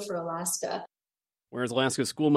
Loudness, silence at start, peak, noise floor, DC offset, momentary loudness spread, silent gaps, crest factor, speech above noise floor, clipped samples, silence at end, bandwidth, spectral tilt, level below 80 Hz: -30 LUFS; 0 s; -10 dBFS; under -90 dBFS; under 0.1%; 12 LU; none; 20 dB; over 61 dB; under 0.1%; 0 s; 15.5 kHz; -4 dB/octave; -74 dBFS